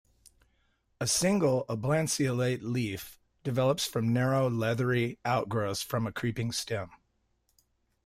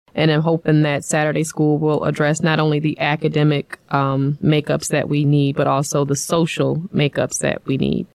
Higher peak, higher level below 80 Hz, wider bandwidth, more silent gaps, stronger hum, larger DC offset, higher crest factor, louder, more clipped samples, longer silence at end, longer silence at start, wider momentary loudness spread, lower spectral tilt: second, -14 dBFS vs -2 dBFS; second, -62 dBFS vs -50 dBFS; first, 16 kHz vs 13.5 kHz; neither; neither; neither; about the same, 16 dB vs 16 dB; second, -30 LUFS vs -18 LUFS; neither; first, 1.1 s vs 0.1 s; first, 1 s vs 0.15 s; first, 9 LU vs 3 LU; about the same, -5 dB/octave vs -5.5 dB/octave